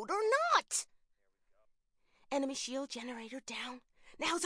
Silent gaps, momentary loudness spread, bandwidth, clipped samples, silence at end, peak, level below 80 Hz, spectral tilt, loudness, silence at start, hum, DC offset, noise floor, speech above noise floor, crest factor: none; 15 LU; 10.5 kHz; under 0.1%; 0 s; -14 dBFS; -76 dBFS; -0.5 dB/octave; -36 LUFS; 0 s; none; under 0.1%; -75 dBFS; 36 dB; 22 dB